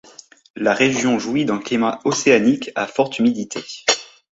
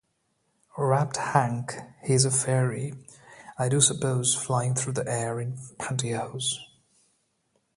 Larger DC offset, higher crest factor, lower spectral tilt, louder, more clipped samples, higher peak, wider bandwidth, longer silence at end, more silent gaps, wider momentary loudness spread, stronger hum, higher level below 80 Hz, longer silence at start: neither; second, 18 dB vs 24 dB; about the same, -3.5 dB/octave vs -4 dB/octave; first, -19 LUFS vs -26 LUFS; neither; first, 0 dBFS vs -4 dBFS; second, 8 kHz vs 11.5 kHz; second, 0.3 s vs 1.1 s; neither; second, 7 LU vs 14 LU; neither; about the same, -60 dBFS vs -62 dBFS; second, 0.55 s vs 0.75 s